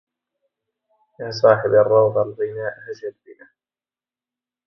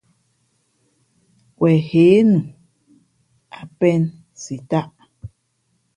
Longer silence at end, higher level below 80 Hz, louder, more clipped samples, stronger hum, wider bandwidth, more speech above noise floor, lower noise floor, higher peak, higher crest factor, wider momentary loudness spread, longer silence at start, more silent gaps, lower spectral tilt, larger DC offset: first, 1.35 s vs 0.7 s; second, -64 dBFS vs -56 dBFS; about the same, -18 LUFS vs -17 LUFS; neither; neither; second, 6.2 kHz vs 10 kHz; first, over 71 dB vs 52 dB; first, under -90 dBFS vs -68 dBFS; about the same, 0 dBFS vs -2 dBFS; about the same, 20 dB vs 18 dB; second, 18 LU vs 26 LU; second, 1.2 s vs 1.6 s; neither; second, -6.5 dB/octave vs -8 dB/octave; neither